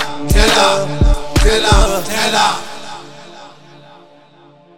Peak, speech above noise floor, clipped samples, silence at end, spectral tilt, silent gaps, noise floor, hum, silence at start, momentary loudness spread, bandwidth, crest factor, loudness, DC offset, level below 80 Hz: 0 dBFS; 32 dB; under 0.1%; 0 s; -3.5 dB/octave; none; -45 dBFS; none; 0 s; 20 LU; 17.5 kHz; 14 dB; -13 LUFS; 5%; -18 dBFS